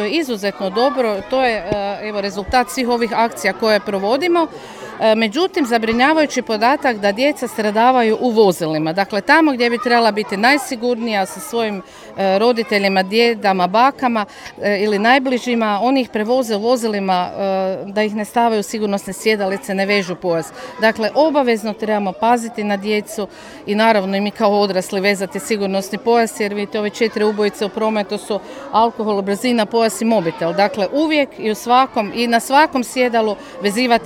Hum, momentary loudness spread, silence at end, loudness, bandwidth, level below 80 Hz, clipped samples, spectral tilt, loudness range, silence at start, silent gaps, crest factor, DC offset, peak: none; 7 LU; 0 s; -17 LUFS; 17 kHz; -52 dBFS; under 0.1%; -4.5 dB/octave; 3 LU; 0 s; none; 16 dB; under 0.1%; 0 dBFS